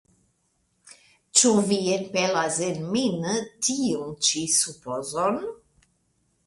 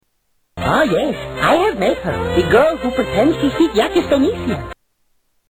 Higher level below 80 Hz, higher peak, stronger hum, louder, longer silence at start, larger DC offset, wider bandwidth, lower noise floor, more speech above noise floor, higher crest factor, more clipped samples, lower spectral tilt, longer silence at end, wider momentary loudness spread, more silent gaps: second, -66 dBFS vs -38 dBFS; about the same, -2 dBFS vs -2 dBFS; neither; second, -23 LUFS vs -16 LUFS; first, 0.9 s vs 0.55 s; neither; second, 11.5 kHz vs 19 kHz; first, -71 dBFS vs -64 dBFS; about the same, 46 dB vs 49 dB; first, 24 dB vs 14 dB; neither; second, -3 dB/octave vs -6 dB/octave; about the same, 0.9 s vs 0.8 s; about the same, 9 LU vs 9 LU; neither